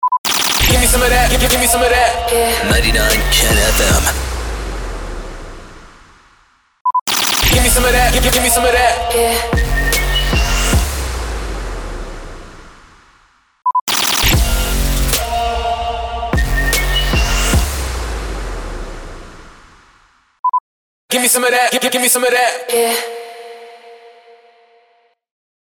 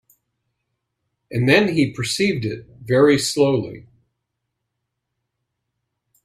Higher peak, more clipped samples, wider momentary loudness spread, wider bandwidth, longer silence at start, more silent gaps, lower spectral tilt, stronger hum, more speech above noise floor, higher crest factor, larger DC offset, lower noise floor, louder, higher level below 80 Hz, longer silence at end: about the same, -2 dBFS vs 0 dBFS; neither; first, 16 LU vs 13 LU; first, over 20 kHz vs 15 kHz; second, 0 s vs 1.3 s; first, 0.18-0.24 s, 6.81-6.85 s, 7.01-7.06 s, 13.81-13.87 s, 20.39-20.44 s, 20.60-21.09 s vs none; second, -2.5 dB/octave vs -5 dB/octave; neither; second, 43 dB vs 60 dB; second, 14 dB vs 22 dB; neither; second, -56 dBFS vs -78 dBFS; first, -14 LUFS vs -18 LUFS; first, -20 dBFS vs -56 dBFS; second, 1.65 s vs 2.45 s